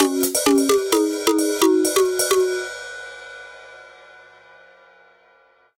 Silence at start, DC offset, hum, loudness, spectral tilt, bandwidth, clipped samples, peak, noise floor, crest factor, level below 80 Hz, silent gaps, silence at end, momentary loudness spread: 0 s; under 0.1%; none; -18 LUFS; -1.5 dB/octave; 17 kHz; under 0.1%; -4 dBFS; -56 dBFS; 18 dB; -60 dBFS; none; 1.9 s; 20 LU